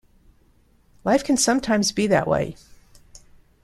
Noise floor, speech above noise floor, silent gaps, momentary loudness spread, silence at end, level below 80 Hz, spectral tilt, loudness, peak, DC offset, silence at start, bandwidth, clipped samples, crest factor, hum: -58 dBFS; 38 dB; none; 7 LU; 0.45 s; -50 dBFS; -4 dB/octave; -21 LUFS; -4 dBFS; under 0.1%; 1.05 s; 14.5 kHz; under 0.1%; 20 dB; none